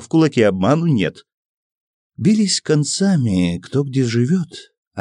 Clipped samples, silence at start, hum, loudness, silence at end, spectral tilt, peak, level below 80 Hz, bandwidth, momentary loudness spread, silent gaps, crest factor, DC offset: under 0.1%; 0 s; none; -17 LUFS; 0 s; -5.5 dB/octave; -2 dBFS; -54 dBFS; 10.5 kHz; 7 LU; 1.34-2.10 s, 4.78-4.91 s; 14 dB; under 0.1%